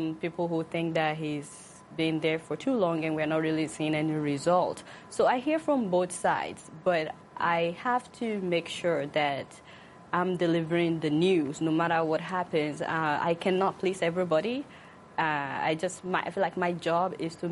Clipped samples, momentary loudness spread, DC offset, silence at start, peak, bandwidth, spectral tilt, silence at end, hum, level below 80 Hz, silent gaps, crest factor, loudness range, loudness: under 0.1%; 8 LU; under 0.1%; 0 s; -14 dBFS; 11.5 kHz; -5.5 dB/octave; 0 s; none; -68 dBFS; none; 16 dB; 2 LU; -29 LUFS